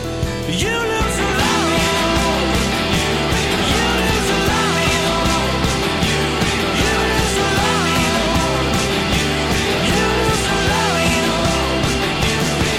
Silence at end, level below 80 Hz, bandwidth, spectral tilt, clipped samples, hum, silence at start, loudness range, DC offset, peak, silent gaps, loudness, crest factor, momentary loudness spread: 0 s; -28 dBFS; 16.5 kHz; -4 dB/octave; under 0.1%; none; 0 s; 0 LU; under 0.1%; -6 dBFS; none; -16 LUFS; 10 dB; 2 LU